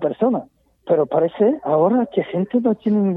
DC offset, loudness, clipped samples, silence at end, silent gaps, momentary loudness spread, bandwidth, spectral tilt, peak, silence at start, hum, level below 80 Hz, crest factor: under 0.1%; -19 LUFS; under 0.1%; 0 s; none; 5 LU; 4 kHz; -11 dB/octave; -4 dBFS; 0 s; none; -64 dBFS; 14 dB